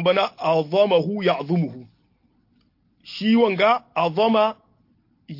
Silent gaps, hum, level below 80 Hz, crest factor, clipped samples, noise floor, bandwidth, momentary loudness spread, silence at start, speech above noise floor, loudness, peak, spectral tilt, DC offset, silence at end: none; none; -68 dBFS; 16 dB; under 0.1%; -63 dBFS; 5.8 kHz; 6 LU; 0 s; 43 dB; -20 LUFS; -6 dBFS; -7.5 dB/octave; under 0.1%; 0 s